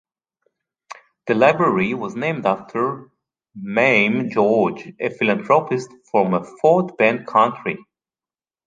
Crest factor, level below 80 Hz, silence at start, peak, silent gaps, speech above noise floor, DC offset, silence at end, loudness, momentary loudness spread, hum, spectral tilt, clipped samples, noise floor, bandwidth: 18 dB; -64 dBFS; 0.9 s; -2 dBFS; none; over 71 dB; under 0.1%; 0.9 s; -19 LUFS; 12 LU; none; -6.5 dB/octave; under 0.1%; under -90 dBFS; 9.2 kHz